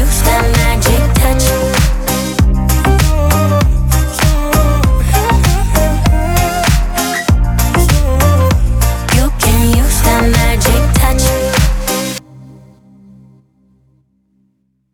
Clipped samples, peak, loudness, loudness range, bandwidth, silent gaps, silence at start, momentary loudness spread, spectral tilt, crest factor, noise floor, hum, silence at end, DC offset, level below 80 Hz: under 0.1%; 0 dBFS; -12 LUFS; 4 LU; 19 kHz; none; 0 s; 3 LU; -5 dB/octave; 10 dB; -60 dBFS; none; 2.4 s; under 0.1%; -14 dBFS